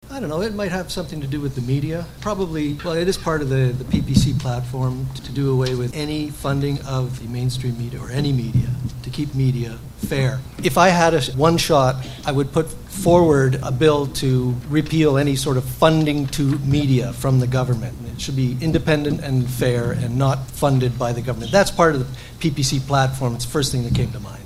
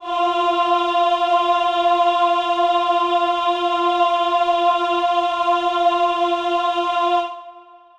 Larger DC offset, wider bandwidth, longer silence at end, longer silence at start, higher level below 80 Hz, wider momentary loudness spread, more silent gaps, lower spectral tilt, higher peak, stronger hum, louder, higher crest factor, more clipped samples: neither; first, 15.5 kHz vs 9.2 kHz; second, 0 s vs 0.35 s; about the same, 0.05 s vs 0 s; first, -36 dBFS vs -60 dBFS; first, 10 LU vs 3 LU; neither; first, -6 dB/octave vs -2.5 dB/octave; first, 0 dBFS vs -6 dBFS; neither; about the same, -20 LUFS vs -18 LUFS; first, 20 dB vs 12 dB; neither